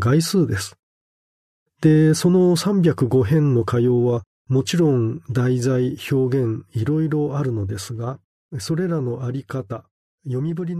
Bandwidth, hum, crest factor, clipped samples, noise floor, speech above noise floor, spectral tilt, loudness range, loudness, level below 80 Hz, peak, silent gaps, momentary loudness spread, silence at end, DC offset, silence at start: 13.5 kHz; none; 16 dB; under 0.1%; under -90 dBFS; over 71 dB; -7 dB/octave; 7 LU; -20 LUFS; -56 dBFS; -4 dBFS; 0.79-1.66 s, 4.27-4.45 s, 8.24-8.49 s, 9.91-10.18 s; 13 LU; 0 s; under 0.1%; 0 s